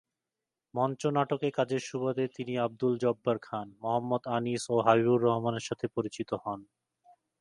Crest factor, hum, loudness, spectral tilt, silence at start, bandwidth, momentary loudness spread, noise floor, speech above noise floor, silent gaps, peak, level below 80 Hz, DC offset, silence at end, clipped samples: 22 dB; none; -31 LUFS; -6 dB/octave; 0.75 s; 11.5 kHz; 10 LU; -90 dBFS; 60 dB; none; -8 dBFS; -72 dBFS; under 0.1%; 0.75 s; under 0.1%